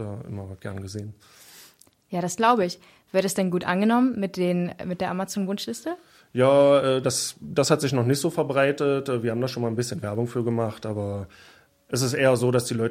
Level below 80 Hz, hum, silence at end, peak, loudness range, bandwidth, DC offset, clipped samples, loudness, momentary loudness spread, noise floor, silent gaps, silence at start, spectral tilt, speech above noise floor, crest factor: -64 dBFS; none; 0 s; -6 dBFS; 5 LU; 16 kHz; under 0.1%; under 0.1%; -24 LUFS; 15 LU; -55 dBFS; none; 0 s; -5.5 dB/octave; 31 dB; 20 dB